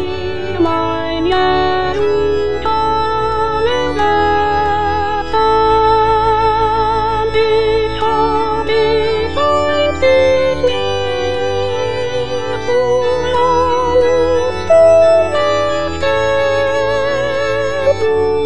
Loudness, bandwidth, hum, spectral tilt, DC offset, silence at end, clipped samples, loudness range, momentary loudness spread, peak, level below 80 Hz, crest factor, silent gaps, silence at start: -14 LUFS; 10.5 kHz; none; -5 dB/octave; 5%; 0 s; under 0.1%; 3 LU; 6 LU; 0 dBFS; -32 dBFS; 12 dB; none; 0 s